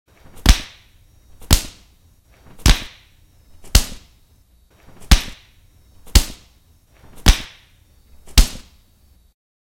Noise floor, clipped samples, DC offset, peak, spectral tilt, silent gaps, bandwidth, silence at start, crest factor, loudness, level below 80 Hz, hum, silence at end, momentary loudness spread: -53 dBFS; under 0.1%; under 0.1%; 0 dBFS; -3 dB/octave; none; 17 kHz; 0.45 s; 20 dB; -19 LUFS; -22 dBFS; none; 1.15 s; 18 LU